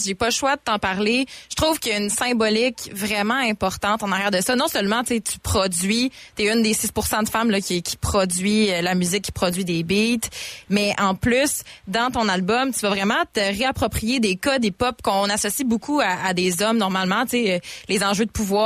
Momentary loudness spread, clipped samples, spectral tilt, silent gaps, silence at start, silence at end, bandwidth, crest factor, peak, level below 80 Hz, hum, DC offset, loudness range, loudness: 4 LU; under 0.1%; -3.5 dB/octave; none; 0 s; 0 s; 15.5 kHz; 14 dB; -6 dBFS; -44 dBFS; none; under 0.1%; 1 LU; -21 LUFS